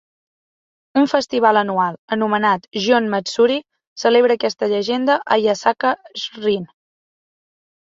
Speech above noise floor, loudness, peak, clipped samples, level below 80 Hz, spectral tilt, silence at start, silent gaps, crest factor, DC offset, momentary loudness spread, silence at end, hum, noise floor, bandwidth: over 73 dB; -18 LUFS; -2 dBFS; under 0.1%; -66 dBFS; -4.5 dB/octave; 0.95 s; 1.99-2.08 s, 3.87-3.96 s; 18 dB; under 0.1%; 7 LU; 1.25 s; none; under -90 dBFS; 7.8 kHz